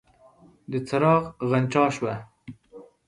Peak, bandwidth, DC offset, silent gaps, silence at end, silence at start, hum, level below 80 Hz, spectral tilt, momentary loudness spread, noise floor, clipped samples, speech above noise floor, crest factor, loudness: -6 dBFS; 11 kHz; under 0.1%; none; 0.25 s; 0.7 s; none; -62 dBFS; -7 dB/octave; 17 LU; -55 dBFS; under 0.1%; 32 dB; 20 dB; -24 LUFS